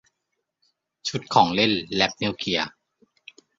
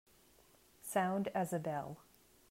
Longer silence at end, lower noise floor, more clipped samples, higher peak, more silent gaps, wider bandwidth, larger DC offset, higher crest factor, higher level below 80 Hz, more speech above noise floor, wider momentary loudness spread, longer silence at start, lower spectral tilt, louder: first, 0.9 s vs 0.5 s; first, -79 dBFS vs -67 dBFS; neither; first, -2 dBFS vs -22 dBFS; neither; second, 7.8 kHz vs 16 kHz; neither; first, 24 dB vs 18 dB; first, -58 dBFS vs -76 dBFS; first, 57 dB vs 30 dB; second, 11 LU vs 15 LU; first, 1.05 s vs 0.85 s; second, -4 dB/octave vs -5.5 dB/octave; first, -23 LUFS vs -38 LUFS